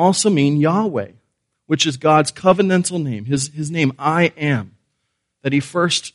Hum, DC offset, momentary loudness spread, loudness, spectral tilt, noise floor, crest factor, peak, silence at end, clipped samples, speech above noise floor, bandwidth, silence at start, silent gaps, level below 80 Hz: none; under 0.1%; 9 LU; -18 LUFS; -5 dB/octave; -73 dBFS; 18 dB; 0 dBFS; 0.05 s; under 0.1%; 56 dB; 11.5 kHz; 0 s; none; -58 dBFS